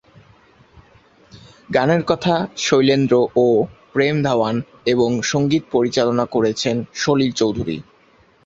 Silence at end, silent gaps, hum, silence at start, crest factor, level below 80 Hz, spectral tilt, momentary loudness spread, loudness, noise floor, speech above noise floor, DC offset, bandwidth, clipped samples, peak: 0.65 s; none; none; 1.35 s; 18 dB; -52 dBFS; -5.5 dB/octave; 7 LU; -18 LUFS; -54 dBFS; 36 dB; under 0.1%; 8 kHz; under 0.1%; -2 dBFS